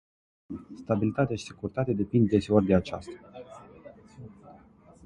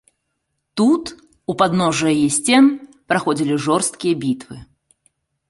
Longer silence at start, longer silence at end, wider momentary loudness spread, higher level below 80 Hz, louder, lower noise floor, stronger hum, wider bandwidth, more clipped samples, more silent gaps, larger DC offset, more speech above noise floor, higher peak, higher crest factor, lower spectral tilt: second, 0.5 s vs 0.75 s; second, 0.55 s vs 0.85 s; first, 25 LU vs 17 LU; first, -52 dBFS vs -58 dBFS; second, -27 LUFS vs -17 LUFS; second, -54 dBFS vs -74 dBFS; neither; about the same, 10.5 kHz vs 11.5 kHz; neither; neither; neither; second, 28 dB vs 57 dB; second, -6 dBFS vs -2 dBFS; about the same, 22 dB vs 18 dB; first, -8 dB/octave vs -4.5 dB/octave